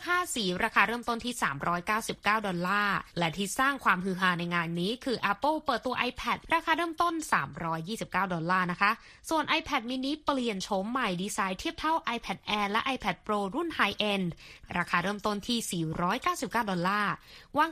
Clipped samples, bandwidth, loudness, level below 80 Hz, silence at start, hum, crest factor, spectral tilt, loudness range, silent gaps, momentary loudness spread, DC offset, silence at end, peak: under 0.1%; 15 kHz; -30 LUFS; -56 dBFS; 0 s; none; 22 dB; -4 dB/octave; 2 LU; none; 6 LU; under 0.1%; 0 s; -8 dBFS